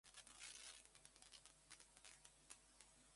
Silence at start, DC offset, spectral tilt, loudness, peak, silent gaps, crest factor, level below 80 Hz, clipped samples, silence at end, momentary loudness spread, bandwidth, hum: 0.05 s; under 0.1%; 0 dB/octave; -62 LUFS; -40 dBFS; none; 26 dB; -82 dBFS; under 0.1%; 0 s; 9 LU; 11.5 kHz; none